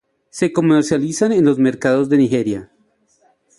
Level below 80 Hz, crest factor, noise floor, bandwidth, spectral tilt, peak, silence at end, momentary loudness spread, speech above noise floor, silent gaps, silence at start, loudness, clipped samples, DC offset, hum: -56 dBFS; 14 dB; -60 dBFS; 11.5 kHz; -6 dB/octave; -2 dBFS; 0.95 s; 8 LU; 45 dB; none; 0.35 s; -16 LUFS; under 0.1%; under 0.1%; none